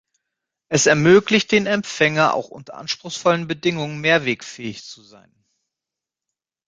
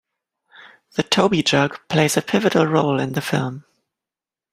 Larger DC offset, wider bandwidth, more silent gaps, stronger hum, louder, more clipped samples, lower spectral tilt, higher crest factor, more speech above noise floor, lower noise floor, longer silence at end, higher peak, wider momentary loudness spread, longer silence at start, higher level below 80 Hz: neither; second, 9.6 kHz vs 16 kHz; neither; neither; about the same, -18 LUFS vs -19 LUFS; neither; about the same, -4 dB/octave vs -4.5 dB/octave; about the same, 20 dB vs 20 dB; second, 67 dB vs 71 dB; about the same, -87 dBFS vs -89 dBFS; first, 1.75 s vs 0.9 s; about the same, -2 dBFS vs -2 dBFS; first, 18 LU vs 10 LU; about the same, 0.7 s vs 0.65 s; about the same, -60 dBFS vs -58 dBFS